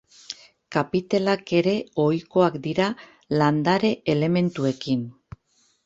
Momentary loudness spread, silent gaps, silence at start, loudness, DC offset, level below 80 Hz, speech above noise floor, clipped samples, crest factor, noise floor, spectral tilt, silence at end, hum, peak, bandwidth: 17 LU; none; 0.3 s; -23 LUFS; under 0.1%; -60 dBFS; 43 dB; under 0.1%; 18 dB; -65 dBFS; -7 dB/octave; 0.75 s; none; -6 dBFS; 8 kHz